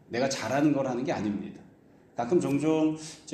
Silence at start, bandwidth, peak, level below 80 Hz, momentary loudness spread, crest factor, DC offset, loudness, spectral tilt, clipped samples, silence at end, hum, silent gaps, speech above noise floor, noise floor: 0.1 s; 13 kHz; -12 dBFS; -66 dBFS; 12 LU; 16 dB; under 0.1%; -28 LUFS; -5.5 dB/octave; under 0.1%; 0 s; none; none; 29 dB; -57 dBFS